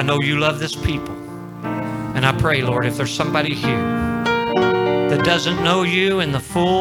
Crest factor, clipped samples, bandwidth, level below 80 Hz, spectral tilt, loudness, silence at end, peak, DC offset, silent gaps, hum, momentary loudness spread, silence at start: 18 dB; under 0.1%; over 20 kHz; -42 dBFS; -5.5 dB/octave; -19 LUFS; 0 s; 0 dBFS; under 0.1%; none; none; 9 LU; 0 s